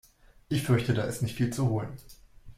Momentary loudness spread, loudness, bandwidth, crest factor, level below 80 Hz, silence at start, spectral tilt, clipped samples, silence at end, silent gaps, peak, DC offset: 10 LU; -29 LUFS; 16 kHz; 18 dB; -54 dBFS; 0.5 s; -6.5 dB/octave; under 0.1%; 0.05 s; none; -12 dBFS; under 0.1%